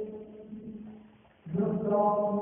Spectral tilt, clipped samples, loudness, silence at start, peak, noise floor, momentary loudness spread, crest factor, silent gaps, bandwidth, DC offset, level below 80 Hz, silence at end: -7.5 dB/octave; under 0.1%; -29 LUFS; 0 s; -16 dBFS; -56 dBFS; 20 LU; 16 dB; none; 3.5 kHz; under 0.1%; -66 dBFS; 0 s